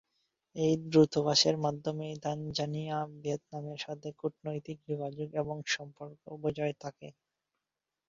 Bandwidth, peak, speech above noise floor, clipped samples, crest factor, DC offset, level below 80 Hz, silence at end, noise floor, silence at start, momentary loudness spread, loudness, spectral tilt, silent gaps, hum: 7.8 kHz; -12 dBFS; 56 dB; under 0.1%; 22 dB; under 0.1%; -68 dBFS; 1 s; -89 dBFS; 0.55 s; 18 LU; -33 LUFS; -5 dB/octave; none; none